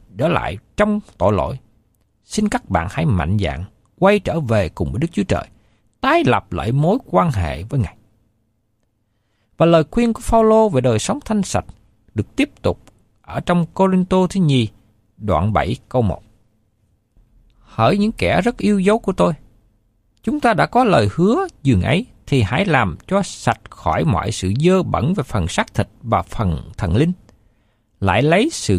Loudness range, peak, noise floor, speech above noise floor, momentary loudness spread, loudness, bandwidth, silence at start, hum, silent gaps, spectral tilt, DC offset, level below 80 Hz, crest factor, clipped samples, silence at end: 4 LU; -2 dBFS; -66 dBFS; 49 dB; 9 LU; -18 LUFS; 14 kHz; 0.15 s; none; none; -6.5 dB/octave; under 0.1%; -38 dBFS; 16 dB; under 0.1%; 0 s